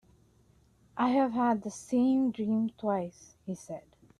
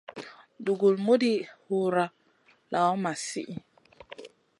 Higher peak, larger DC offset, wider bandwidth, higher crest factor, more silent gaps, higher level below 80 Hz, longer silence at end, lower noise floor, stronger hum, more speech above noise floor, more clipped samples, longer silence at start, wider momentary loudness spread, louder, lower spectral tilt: about the same, -14 dBFS vs -12 dBFS; neither; about the same, 11.5 kHz vs 11.5 kHz; about the same, 16 dB vs 18 dB; neither; about the same, -70 dBFS vs -74 dBFS; about the same, 0.4 s vs 0.35 s; about the same, -64 dBFS vs -64 dBFS; neither; about the same, 35 dB vs 38 dB; neither; first, 0.95 s vs 0.1 s; second, 17 LU vs 22 LU; second, -30 LUFS vs -27 LUFS; about the same, -6.5 dB/octave vs -5.5 dB/octave